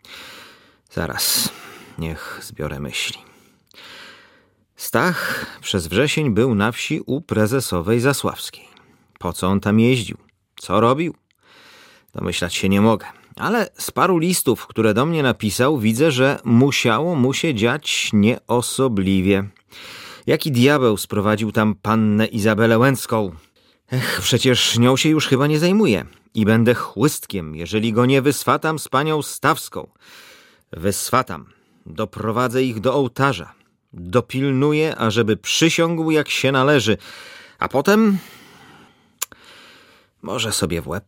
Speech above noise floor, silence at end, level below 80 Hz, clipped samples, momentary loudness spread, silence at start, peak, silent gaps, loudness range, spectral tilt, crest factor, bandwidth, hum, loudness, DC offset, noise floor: 38 dB; 0.1 s; -50 dBFS; under 0.1%; 15 LU; 0.1 s; -2 dBFS; none; 6 LU; -5 dB/octave; 18 dB; 17 kHz; none; -19 LUFS; under 0.1%; -57 dBFS